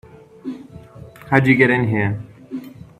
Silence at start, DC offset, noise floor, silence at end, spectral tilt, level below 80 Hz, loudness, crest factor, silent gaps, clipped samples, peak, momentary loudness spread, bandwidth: 0.45 s; under 0.1%; -40 dBFS; 0.15 s; -8 dB/octave; -54 dBFS; -16 LUFS; 20 dB; none; under 0.1%; 0 dBFS; 20 LU; 14.5 kHz